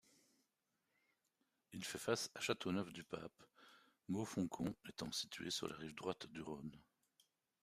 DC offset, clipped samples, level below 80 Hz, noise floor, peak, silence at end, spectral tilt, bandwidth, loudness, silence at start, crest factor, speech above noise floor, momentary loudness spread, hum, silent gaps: under 0.1%; under 0.1%; -78 dBFS; -87 dBFS; -24 dBFS; 0.8 s; -4 dB/octave; 15 kHz; -45 LUFS; 1.7 s; 24 dB; 42 dB; 11 LU; none; none